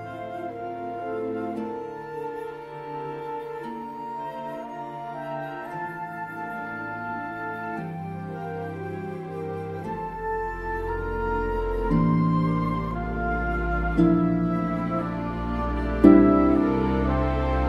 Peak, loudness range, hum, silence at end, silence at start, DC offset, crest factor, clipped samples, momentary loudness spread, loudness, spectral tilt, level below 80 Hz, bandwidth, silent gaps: -2 dBFS; 12 LU; none; 0 s; 0 s; under 0.1%; 24 dB; under 0.1%; 14 LU; -26 LUFS; -9.5 dB/octave; -36 dBFS; 12 kHz; none